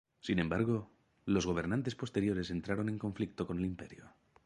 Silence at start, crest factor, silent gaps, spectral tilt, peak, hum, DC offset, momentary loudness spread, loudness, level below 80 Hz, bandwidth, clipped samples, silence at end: 0.25 s; 18 dB; none; -6.5 dB/octave; -18 dBFS; none; under 0.1%; 6 LU; -36 LUFS; -56 dBFS; 11 kHz; under 0.1%; 0.35 s